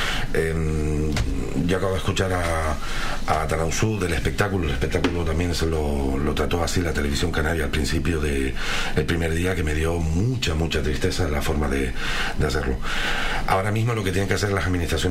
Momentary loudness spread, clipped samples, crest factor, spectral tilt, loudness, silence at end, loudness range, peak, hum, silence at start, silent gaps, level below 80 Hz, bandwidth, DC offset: 3 LU; under 0.1%; 16 dB; -5 dB/octave; -24 LUFS; 0 s; 1 LU; -6 dBFS; none; 0 s; none; -28 dBFS; 16 kHz; 0.3%